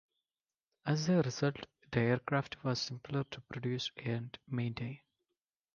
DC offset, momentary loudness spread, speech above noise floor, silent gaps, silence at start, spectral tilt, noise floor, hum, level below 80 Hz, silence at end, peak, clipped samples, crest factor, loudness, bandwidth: under 0.1%; 12 LU; over 55 dB; none; 0.85 s; -6 dB/octave; under -90 dBFS; none; -68 dBFS; 0.8 s; -16 dBFS; under 0.1%; 22 dB; -36 LUFS; 7.2 kHz